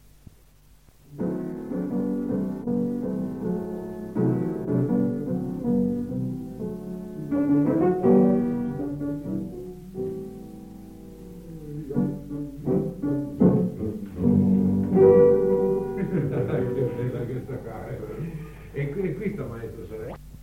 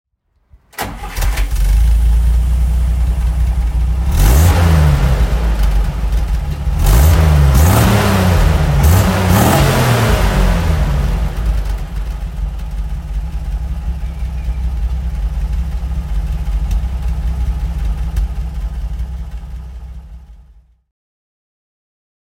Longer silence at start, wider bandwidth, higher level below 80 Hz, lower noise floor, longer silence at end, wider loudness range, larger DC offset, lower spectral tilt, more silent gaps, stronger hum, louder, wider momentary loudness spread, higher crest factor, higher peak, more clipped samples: first, 1.1 s vs 0.75 s; about the same, 15.5 kHz vs 16.5 kHz; second, -48 dBFS vs -16 dBFS; first, -55 dBFS vs -50 dBFS; second, 0 s vs 2 s; about the same, 11 LU vs 12 LU; neither; first, -10.5 dB/octave vs -6 dB/octave; neither; neither; second, -25 LUFS vs -16 LUFS; first, 17 LU vs 14 LU; first, 20 dB vs 14 dB; second, -6 dBFS vs 0 dBFS; neither